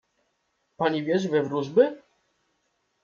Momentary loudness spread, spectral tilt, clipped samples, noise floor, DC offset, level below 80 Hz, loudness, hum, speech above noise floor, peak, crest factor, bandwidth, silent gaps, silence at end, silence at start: 5 LU; -6.5 dB/octave; under 0.1%; -74 dBFS; under 0.1%; -74 dBFS; -25 LUFS; none; 51 dB; -6 dBFS; 20 dB; 7.2 kHz; none; 1.05 s; 0.8 s